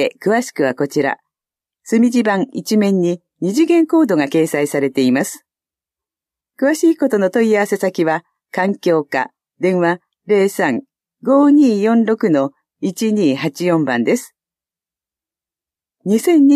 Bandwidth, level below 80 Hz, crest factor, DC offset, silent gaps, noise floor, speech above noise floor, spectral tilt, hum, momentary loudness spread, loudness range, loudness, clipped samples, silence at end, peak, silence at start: 15 kHz; -70 dBFS; 14 dB; under 0.1%; none; -90 dBFS; 75 dB; -6 dB/octave; none; 9 LU; 3 LU; -16 LUFS; under 0.1%; 0 s; -2 dBFS; 0 s